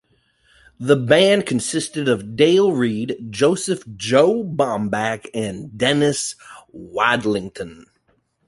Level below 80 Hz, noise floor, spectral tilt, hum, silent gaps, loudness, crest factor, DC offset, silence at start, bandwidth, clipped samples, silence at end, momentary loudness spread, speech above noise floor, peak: -56 dBFS; -64 dBFS; -4.5 dB/octave; none; none; -19 LUFS; 18 dB; under 0.1%; 0.8 s; 11.5 kHz; under 0.1%; 0.65 s; 13 LU; 46 dB; -2 dBFS